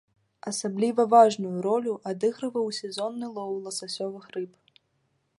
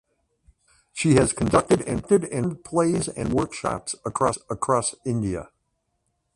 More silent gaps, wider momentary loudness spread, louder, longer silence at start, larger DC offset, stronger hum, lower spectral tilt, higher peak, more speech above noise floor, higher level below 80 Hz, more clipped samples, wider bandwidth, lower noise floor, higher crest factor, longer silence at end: neither; first, 17 LU vs 9 LU; second, -27 LUFS vs -24 LUFS; second, 0.45 s vs 0.95 s; neither; neither; about the same, -4.5 dB/octave vs -5.5 dB/octave; about the same, -6 dBFS vs -4 dBFS; second, 47 dB vs 51 dB; second, -80 dBFS vs -46 dBFS; neither; about the same, 11.5 kHz vs 11.5 kHz; about the same, -73 dBFS vs -74 dBFS; about the same, 22 dB vs 20 dB; about the same, 0.9 s vs 0.9 s